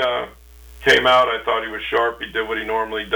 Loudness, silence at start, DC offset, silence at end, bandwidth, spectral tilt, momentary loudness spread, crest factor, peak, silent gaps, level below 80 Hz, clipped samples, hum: -19 LUFS; 0 s; under 0.1%; 0 s; over 20 kHz; -3 dB/octave; 11 LU; 14 dB; -6 dBFS; none; -46 dBFS; under 0.1%; none